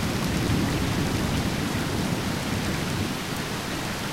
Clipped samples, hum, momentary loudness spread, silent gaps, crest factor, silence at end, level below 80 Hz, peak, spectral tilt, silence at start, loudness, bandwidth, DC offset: under 0.1%; none; 5 LU; none; 14 dB; 0 s; -38 dBFS; -12 dBFS; -5 dB/octave; 0 s; -27 LUFS; 16 kHz; 0.3%